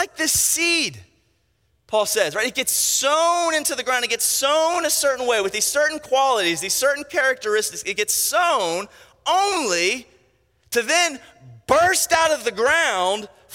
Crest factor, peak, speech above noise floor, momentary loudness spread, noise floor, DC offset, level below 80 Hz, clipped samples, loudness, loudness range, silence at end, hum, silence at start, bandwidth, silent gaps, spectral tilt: 18 dB; -2 dBFS; 45 dB; 7 LU; -66 dBFS; under 0.1%; -58 dBFS; under 0.1%; -19 LUFS; 2 LU; 0 s; none; 0 s; 17 kHz; none; -0.5 dB/octave